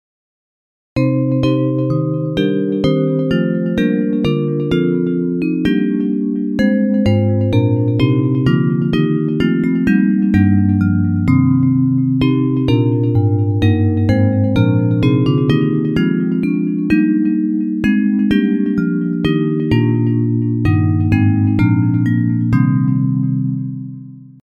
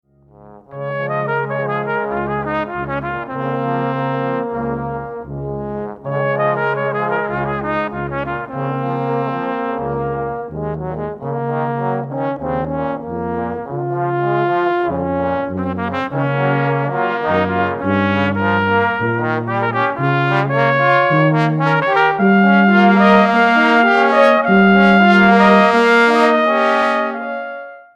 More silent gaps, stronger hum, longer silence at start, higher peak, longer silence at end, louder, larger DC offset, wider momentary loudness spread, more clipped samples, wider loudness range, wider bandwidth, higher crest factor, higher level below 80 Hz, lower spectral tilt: neither; neither; first, 0.95 s vs 0.4 s; about the same, 0 dBFS vs 0 dBFS; about the same, 0.2 s vs 0.15 s; about the same, -15 LUFS vs -16 LUFS; neither; second, 4 LU vs 13 LU; neither; second, 2 LU vs 11 LU; second, 7 kHz vs 8.6 kHz; about the same, 14 dB vs 16 dB; first, -40 dBFS vs -46 dBFS; first, -9.5 dB/octave vs -7.5 dB/octave